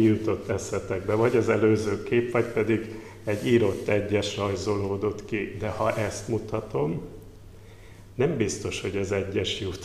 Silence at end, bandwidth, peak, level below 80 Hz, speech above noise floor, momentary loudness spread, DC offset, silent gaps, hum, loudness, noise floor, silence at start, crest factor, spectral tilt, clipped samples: 0 s; 14 kHz; -8 dBFS; -50 dBFS; 21 dB; 9 LU; 0.1%; none; none; -27 LUFS; -46 dBFS; 0 s; 18 dB; -6 dB/octave; under 0.1%